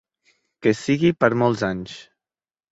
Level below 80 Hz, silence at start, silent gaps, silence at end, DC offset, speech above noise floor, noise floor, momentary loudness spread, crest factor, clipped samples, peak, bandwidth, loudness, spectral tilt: -56 dBFS; 0.6 s; none; 0.7 s; under 0.1%; over 70 dB; under -90 dBFS; 16 LU; 20 dB; under 0.1%; -2 dBFS; 8 kHz; -21 LUFS; -6.5 dB/octave